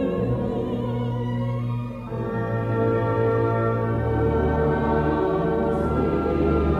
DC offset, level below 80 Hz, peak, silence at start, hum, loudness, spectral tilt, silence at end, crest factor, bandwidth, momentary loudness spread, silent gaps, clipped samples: under 0.1%; -34 dBFS; -8 dBFS; 0 s; none; -23 LUFS; -10 dB/octave; 0 s; 14 dB; 5.6 kHz; 5 LU; none; under 0.1%